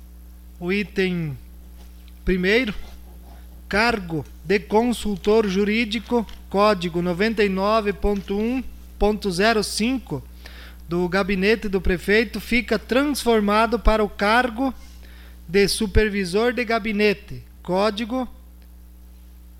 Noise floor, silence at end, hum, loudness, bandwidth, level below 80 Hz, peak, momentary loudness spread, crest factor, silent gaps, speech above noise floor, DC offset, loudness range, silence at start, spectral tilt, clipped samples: -44 dBFS; 0 s; none; -21 LUFS; 16.5 kHz; -34 dBFS; -2 dBFS; 12 LU; 20 dB; none; 23 dB; under 0.1%; 4 LU; 0 s; -5 dB/octave; under 0.1%